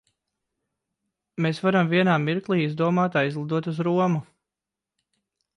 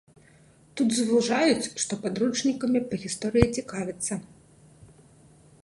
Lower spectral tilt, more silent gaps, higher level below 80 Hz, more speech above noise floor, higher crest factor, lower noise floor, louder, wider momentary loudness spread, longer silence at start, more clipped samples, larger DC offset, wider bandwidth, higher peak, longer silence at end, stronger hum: first, -7.5 dB/octave vs -4.5 dB/octave; neither; second, -70 dBFS vs -48 dBFS; first, 65 dB vs 31 dB; second, 16 dB vs 26 dB; first, -88 dBFS vs -56 dBFS; first, -23 LUFS vs -26 LUFS; about the same, 7 LU vs 9 LU; first, 1.4 s vs 0.75 s; neither; neither; second, 9.8 kHz vs 11.5 kHz; second, -10 dBFS vs -2 dBFS; first, 1.35 s vs 0.8 s; neither